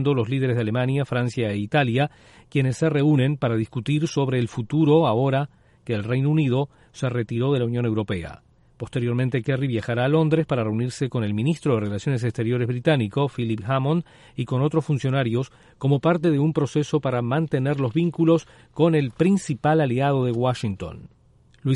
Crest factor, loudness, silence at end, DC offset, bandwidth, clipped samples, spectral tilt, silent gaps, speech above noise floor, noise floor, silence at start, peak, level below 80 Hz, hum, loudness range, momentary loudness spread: 16 dB; -23 LUFS; 0 s; under 0.1%; 11.5 kHz; under 0.1%; -7.5 dB/octave; none; 20 dB; -42 dBFS; 0 s; -6 dBFS; -54 dBFS; none; 3 LU; 8 LU